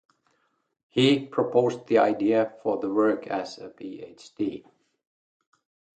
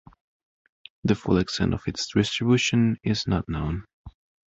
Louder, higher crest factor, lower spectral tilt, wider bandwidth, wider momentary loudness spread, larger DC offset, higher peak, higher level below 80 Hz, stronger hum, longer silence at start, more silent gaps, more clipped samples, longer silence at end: about the same, -25 LUFS vs -25 LUFS; about the same, 20 dB vs 18 dB; about the same, -6 dB/octave vs -5.5 dB/octave; first, 9 kHz vs 8 kHz; first, 18 LU vs 8 LU; neither; about the same, -8 dBFS vs -8 dBFS; second, -70 dBFS vs -42 dBFS; neither; about the same, 0.95 s vs 1.05 s; second, none vs 3.93-4.05 s; neither; first, 1.35 s vs 0.4 s